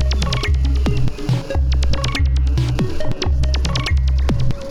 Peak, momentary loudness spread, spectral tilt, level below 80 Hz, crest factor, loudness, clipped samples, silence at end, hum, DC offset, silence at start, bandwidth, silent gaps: -6 dBFS; 4 LU; -6 dB/octave; -18 dBFS; 10 dB; -19 LUFS; under 0.1%; 0 s; none; under 0.1%; 0 s; 10 kHz; none